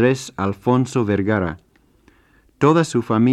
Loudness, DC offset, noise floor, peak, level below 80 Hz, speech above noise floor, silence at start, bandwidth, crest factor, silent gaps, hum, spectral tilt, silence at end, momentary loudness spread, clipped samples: -19 LUFS; under 0.1%; -56 dBFS; -2 dBFS; -52 dBFS; 38 dB; 0 s; 12.5 kHz; 16 dB; none; none; -7 dB/octave; 0 s; 8 LU; under 0.1%